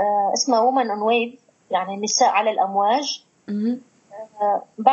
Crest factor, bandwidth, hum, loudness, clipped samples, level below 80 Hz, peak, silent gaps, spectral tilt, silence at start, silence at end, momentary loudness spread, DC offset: 20 dB; 7.6 kHz; none; -21 LUFS; under 0.1%; -82 dBFS; -2 dBFS; none; -2.5 dB/octave; 0 s; 0 s; 13 LU; under 0.1%